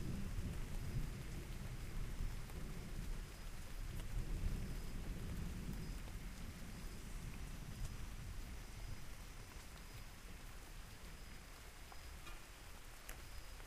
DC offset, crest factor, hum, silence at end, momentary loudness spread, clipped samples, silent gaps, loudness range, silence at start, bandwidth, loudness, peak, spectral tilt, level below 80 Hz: under 0.1%; 18 dB; none; 0 s; 9 LU; under 0.1%; none; 7 LU; 0 s; 15.5 kHz; -51 LUFS; -30 dBFS; -5 dB/octave; -48 dBFS